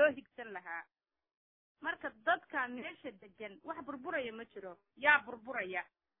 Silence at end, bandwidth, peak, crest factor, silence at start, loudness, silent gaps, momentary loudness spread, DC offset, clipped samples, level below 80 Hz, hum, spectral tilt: 0.35 s; 4 kHz; -14 dBFS; 24 dB; 0 s; -37 LUFS; 1.37-1.75 s; 20 LU; under 0.1%; under 0.1%; -78 dBFS; none; -6.5 dB/octave